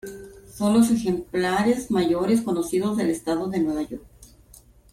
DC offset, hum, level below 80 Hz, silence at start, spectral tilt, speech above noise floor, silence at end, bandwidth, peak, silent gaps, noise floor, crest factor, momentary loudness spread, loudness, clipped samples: under 0.1%; none; -52 dBFS; 0.05 s; -5.5 dB/octave; 29 dB; 0.7 s; 15.5 kHz; -8 dBFS; none; -52 dBFS; 16 dB; 15 LU; -23 LUFS; under 0.1%